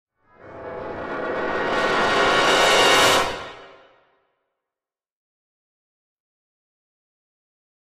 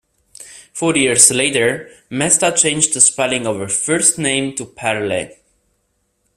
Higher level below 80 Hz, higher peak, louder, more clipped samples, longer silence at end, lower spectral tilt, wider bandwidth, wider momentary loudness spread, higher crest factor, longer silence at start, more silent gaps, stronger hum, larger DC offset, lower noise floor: about the same, -50 dBFS vs -54 dBFS; second, -4 dBFS vs 0 dBFS; second, -18 LUFS vs -14 LUFS; neither; first, 4.2 s vs 1.1 s; about the same, -2 dB/octave vs -2 dB/octave; about the same, 15.5 kHz vs 16 kHz; first, 19 LU vs 14 LU; about the same, 20 dB vs 18 dB; about the same, 0.45 s vs 0.4 s; neither; neither; neither; first, under -90 dBFS vs -66 dBFS